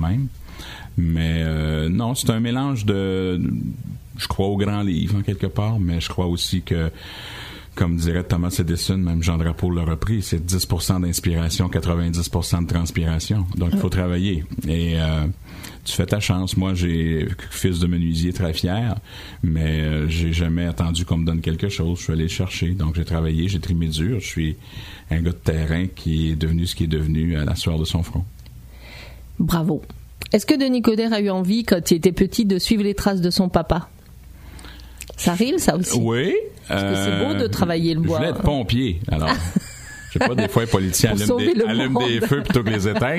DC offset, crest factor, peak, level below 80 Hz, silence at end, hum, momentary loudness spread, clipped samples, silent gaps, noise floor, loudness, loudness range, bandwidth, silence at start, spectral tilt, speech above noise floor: under 0.1%; 20 dB; -2 dBFS; -32 dBFS; 0 s; none; 10 LU; under 0.1%; none; -42 dBFS; -21 LUFS; 4 LU; 15.5 kHz; 0 s; -5.5 dB/octave; 21 dB